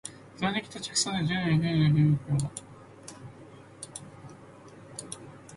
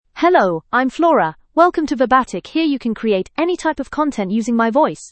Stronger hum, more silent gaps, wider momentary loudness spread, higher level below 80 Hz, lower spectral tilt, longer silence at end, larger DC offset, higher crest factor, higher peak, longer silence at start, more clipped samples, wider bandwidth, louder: neither; neither; first, 25 LU vs 6 LU; second, -58 dBFS vs -50 dBFS; about the same, -5 dB/octave vs -5.5 dB/octave; about the same, 0 s vs 0.05 s; neither; about the same, 16 dB vs 16 dB; second, -14 dBFS vs 0 dBFS; about the same, 0.05 s vs 0.15 s; neither; first, 11.5 kHz vs 8.8 kHz; second, -27 LUFS vs -17 LUFS